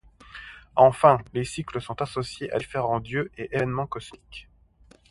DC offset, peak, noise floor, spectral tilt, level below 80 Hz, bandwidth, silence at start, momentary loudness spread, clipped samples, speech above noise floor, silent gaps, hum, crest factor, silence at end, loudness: under 0.1%; -2 dBFS; -57 dBFS; -6 dB/octave; -52 dBFS; 11.5 kHz; 0.35 s; 23 LU; under 0.1%; 32 dB; none; none; 24 dB; 0.7 s; -25 LUFS